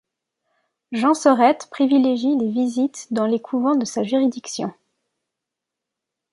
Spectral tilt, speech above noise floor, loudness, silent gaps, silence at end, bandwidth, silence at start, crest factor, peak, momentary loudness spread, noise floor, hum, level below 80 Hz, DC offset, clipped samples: -5 dB/octave; 65 dB; -20 LUFS; none; 1.6 s; 11.5 kHz; 0.9 s; 20 dB; -2 dBFS; 12 LU; -84 dBFS; none; -72 dBFS; under 0.1%; under 0.1%